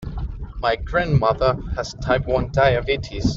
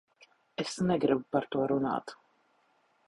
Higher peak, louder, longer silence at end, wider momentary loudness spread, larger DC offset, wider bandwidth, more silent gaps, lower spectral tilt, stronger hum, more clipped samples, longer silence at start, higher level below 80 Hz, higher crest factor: first, -4 dBFS vs -12 dBFS; first, -21 LUFS vs -31 LUFS; second, 0 s vs 0.95 s; about the same, 11 LU vs 11 LU; neither; second, 7.6 kHz vs 11.5 kHz; neither; about the same, -6.5 dB/octave vs -6 dB/octave; neither; neither; second, 0 s vs 0.6 s; first, -32 dBFS vs -68 dBFS; about the same, 16 dB vs 20 dB